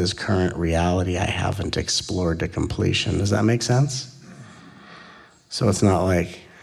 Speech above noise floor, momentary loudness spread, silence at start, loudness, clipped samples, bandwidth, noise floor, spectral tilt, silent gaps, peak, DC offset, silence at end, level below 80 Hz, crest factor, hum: 26 dB; 6 LU; 0 s; -22 LUFS; under 0.1%; 13.5 kHz; -48 dBFS; -5 dB/octave; none; -6 dBFS; under 0.1%; 0.2 s; -40 dBFS; 18 dB; none